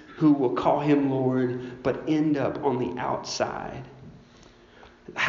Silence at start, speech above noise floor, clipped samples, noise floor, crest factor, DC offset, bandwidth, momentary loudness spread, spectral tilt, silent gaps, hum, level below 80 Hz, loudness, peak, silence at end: 0 s; 28 dB; under 0.1%; -52 dBFS; 18 dB; under 0.1%; 7.4 kHz; 14 LU; -5.5 dB/octave; none; none; -58 dBFS; -25 LUFS; -8 dBFS; 0 s